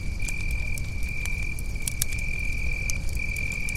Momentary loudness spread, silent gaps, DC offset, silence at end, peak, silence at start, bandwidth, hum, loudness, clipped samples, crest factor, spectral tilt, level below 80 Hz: 3 LU; none; under 0.1%; 0 s; -2 dBFS; 0 s; 16.5 kHz; none; -30 LUFS; under 0.1%; 24 dB; -3 dB/octave; -30 dBFS